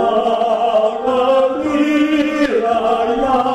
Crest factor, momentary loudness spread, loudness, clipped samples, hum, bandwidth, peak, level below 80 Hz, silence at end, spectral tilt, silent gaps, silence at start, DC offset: 12 dB; 2 LU; -15 LUFS; under 0.1%; none; 12 kHz; -4 dBFS; -46 dBFS; 0 s; -5 dB/octave; none; 0 s; under 0.1%